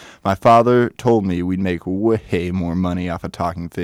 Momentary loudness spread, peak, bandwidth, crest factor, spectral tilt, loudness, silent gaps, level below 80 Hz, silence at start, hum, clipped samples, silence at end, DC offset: 11 LU; -4 dBFS; 14.5 kHz; 14 dB; -7.5 dB/octave; -18 LUFS; none; -44 dBFS; 0 s; none; under 0.1%; 0 s; under 0.1%